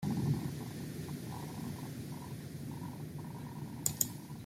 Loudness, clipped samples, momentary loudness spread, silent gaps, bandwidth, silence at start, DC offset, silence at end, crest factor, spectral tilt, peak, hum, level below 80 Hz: -40 LUFS; under 0.1%; 10 LU; none; 16 kHz; 0 s; under 0.1%; 0 s; 30 dB; -5 dB/octave; -10 dBFS; none; -62 dBFS